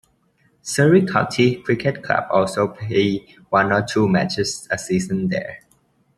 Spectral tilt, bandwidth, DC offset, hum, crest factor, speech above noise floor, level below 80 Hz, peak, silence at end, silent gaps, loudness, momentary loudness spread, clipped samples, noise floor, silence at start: -5.5 dB/octave; 13 kHz; under 0.1%; none; 18 dB; 42 dB; -54 dBFS; -2 dBFS; 0.6 s; none; -19 LUFS; 10 LU; under 0.1%; -61 dBFS; 0.65 s